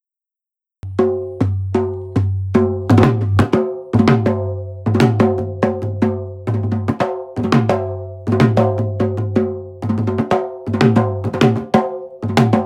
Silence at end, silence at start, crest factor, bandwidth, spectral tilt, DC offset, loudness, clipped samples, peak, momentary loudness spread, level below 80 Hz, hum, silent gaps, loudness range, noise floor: 0 s; 0.85 s; 16 dB; 11 kHz; -8 dB/octave; under 0.1%; -17 LUFS; under 0.1%; 0 dBFS; 9 LU; -48 dBFS; none; none; 3 LU; -84 dBFS